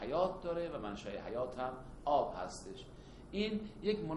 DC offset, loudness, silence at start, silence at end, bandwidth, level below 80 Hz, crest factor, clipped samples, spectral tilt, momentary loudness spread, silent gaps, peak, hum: under 0.1%; -39 LUFS; 0 s; 0 s; 11.5 kHz; -56 dBFS; 20 dB; under 0.1%; -5.5 dB/octave; 14 LU; none; -20 dBFS; none